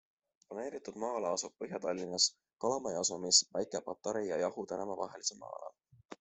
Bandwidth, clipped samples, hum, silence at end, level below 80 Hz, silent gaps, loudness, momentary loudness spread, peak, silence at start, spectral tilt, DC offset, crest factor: 8.2 kHz; under 0.1%; none; 0.05 s; -78 dBFS; none; -34 LUFS; 16 LU; -12 dBFS; 0.5 s; -1.5 dB/octave; under 0.1%; 26 dB